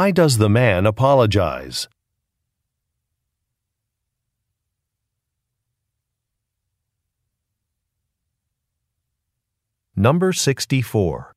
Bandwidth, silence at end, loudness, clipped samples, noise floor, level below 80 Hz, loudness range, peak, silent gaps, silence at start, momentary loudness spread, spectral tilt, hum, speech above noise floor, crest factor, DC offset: 15.5 kHz; 0.15 s; -18 LUFS; under 0.1%; -80 dBFS; -50 dBFS; 17 LU; -2 dBFS; none; 0 s; 12 LU; -5.5 dB/octave; none; 63 dB; 20 dB; under 0.1%